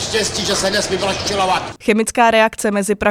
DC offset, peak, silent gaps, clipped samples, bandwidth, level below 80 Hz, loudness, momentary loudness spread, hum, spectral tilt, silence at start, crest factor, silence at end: under 0.1%; 0 dBFS; none; under 0.1%; 16.5 kHz; -42 dBFS; -16 LUFS; 6 LU; none; -3 dB/octave; 0 s; 16 dB; 0 s